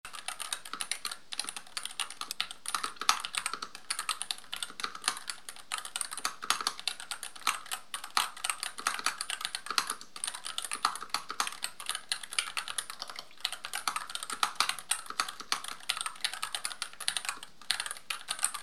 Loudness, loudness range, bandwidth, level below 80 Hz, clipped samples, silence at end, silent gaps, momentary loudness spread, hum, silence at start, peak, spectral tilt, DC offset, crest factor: -34 LUFS; 2 LU; 17 kHz; -74 dBFS; under 0.1%; 0 s; none; 7 LU; none; 0.05 s; -4 dBFS; 2 dB/octave; 0.4%; 34 dB